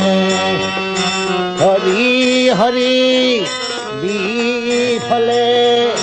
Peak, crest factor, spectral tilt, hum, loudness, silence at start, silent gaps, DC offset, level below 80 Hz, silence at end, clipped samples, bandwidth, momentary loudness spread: -2 dBFS; 12 dB; -4 dB/octave; none; -14 LUFS; 0 s; none; under 0.1%; -52 dBFS; 0 s; under 0.1%; 9.2 kHz; 6 LU